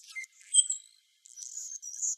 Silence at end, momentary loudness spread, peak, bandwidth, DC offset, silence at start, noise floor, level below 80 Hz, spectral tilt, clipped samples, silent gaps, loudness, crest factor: 0 s; 18 LU; -8 dBFS; 14 kHz; under 0.1%; 0.05 s; -60 dBFS; under -90 dBFS; 13 dB/octave; under 0.1%; none; -28 LUFS; 26 dB